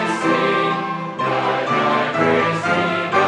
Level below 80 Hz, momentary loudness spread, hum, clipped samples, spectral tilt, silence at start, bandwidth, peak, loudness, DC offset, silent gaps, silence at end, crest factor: -60 dBFS; 5 LU; none; under 0.1%; -5.5 dB/octave; 0 s; 11.5 kHz; -4 dBFS; -18 LUFS; under 0.1%; none; 0 s; 16 dB